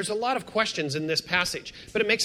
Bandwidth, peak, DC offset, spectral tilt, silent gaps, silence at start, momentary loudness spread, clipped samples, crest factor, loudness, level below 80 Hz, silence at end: 16 kHz; -6 dBFS; under 0.1%; -3 dB/octave; none; 0 s; 5 LU; under 0.1%; 22 dB; -27 LUFS; -58 dBFS; 0 s